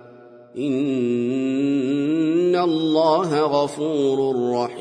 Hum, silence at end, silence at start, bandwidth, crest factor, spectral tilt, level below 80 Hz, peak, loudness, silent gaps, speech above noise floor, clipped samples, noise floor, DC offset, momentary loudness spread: none; 0 s; 0.05 s; 10.5 kHz; 14 dB; -6.5 dB/octave; -70 dBFS; -6 dBFS; -21 LUFS; none; 25 dB; under 0.1%; -45 dBFS; under 0.1%; 5 LU